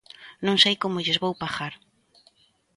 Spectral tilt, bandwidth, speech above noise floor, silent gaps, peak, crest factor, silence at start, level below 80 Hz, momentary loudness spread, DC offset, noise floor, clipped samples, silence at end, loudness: -4 dB/octave; 11.5 kHz; 37 dB; none; -4 dBFS; 22 dB; 0.2 s; -64 dBFS; 13 LU; under 0.1%; -62 dBFS; under 0.1%; 1 s; -23 LUFS